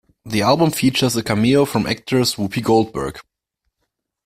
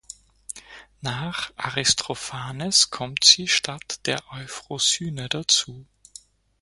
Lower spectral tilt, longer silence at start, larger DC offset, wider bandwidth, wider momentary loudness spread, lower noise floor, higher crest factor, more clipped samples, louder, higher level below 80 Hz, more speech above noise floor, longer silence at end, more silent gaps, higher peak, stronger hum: first, -5 dB/octave vs -1 dB/octave; first, 0.25 s vs 0.1 s; neither; first, 16 kHz vs 11.5 kHz; second, 8 LU vs 20 LU; first, -75 dBFS vs -49 dBFS; second, 16 dB vs 26 dB; neither; first, -18 LUFS vs -21 LUFS; first, -48 dBFS vs -58 dBFS; first, 58 dB vs 25 dB; first, 1.05 s vs 0.8 s; neither; about the same, -2 dBFS vs 0 dBFS; neither